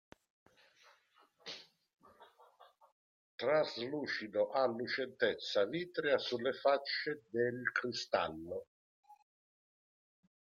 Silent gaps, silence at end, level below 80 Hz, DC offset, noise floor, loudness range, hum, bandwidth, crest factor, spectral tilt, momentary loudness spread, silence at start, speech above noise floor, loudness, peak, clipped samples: 2.92-3.38 s, 8.67-9.03 s; 1.4 s; -82 dBFS; under 0.1%; -70 dBFS; 7 LU; none; 7.4 kHz; 20 dB; -4.5 dB/octave; 14 LU; 1.45 s; 35 dB; -36 LUFS; -18 dBFS; under 0.1%